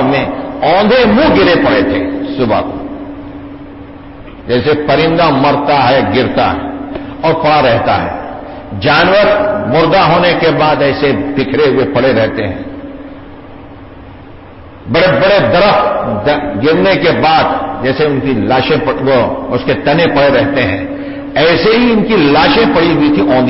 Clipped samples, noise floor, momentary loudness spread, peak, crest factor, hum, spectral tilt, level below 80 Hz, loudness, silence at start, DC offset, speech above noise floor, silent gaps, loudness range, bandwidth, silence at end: under 0.1%; -32 dBFS; 17 LU; 0 dBFS; 10 dB; none; -9.5 dB/octave; -34 dBFS; -10 LUFS; 0 s; under 0.1%; 22 dB; none; 5 LU; 5.8 kHz; 0 s